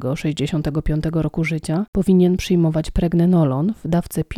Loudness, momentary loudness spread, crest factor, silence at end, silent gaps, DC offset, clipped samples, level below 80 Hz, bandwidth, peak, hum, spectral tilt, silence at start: -19 LUFS; 7 LU; 14 dB; 0 s; 1.88-1.93 s; under 0.1%; under 0.1%; -32 dBFS; 14 kHz; -6 dBFS; none; -7.5 dB/octave; 0 s